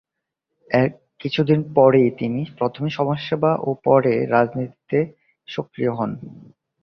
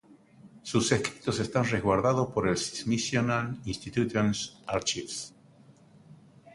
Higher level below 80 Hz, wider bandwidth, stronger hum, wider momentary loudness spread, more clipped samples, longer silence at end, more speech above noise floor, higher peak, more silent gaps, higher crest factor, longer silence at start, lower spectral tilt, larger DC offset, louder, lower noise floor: about the same, -60 dBFS vs -56 dBFS; second, 6.4 kHz vs 11.5 kHz; neither; first, 15 LU vs 9 LU; neither; first, 0.45 s vs 0 s; first, 61 dB vs 28 dB; first, -2 dBFS vs -8 dBFS; neither; about the same, 20 dB vs 22 dB; first, 0.7 s vs 0.1 s; first, -9 dB/octave vs -4.5 dB/octave; neither; first, -20 LUFS vs -29 LUFS; first, -81 dBFS vs -57 dBFS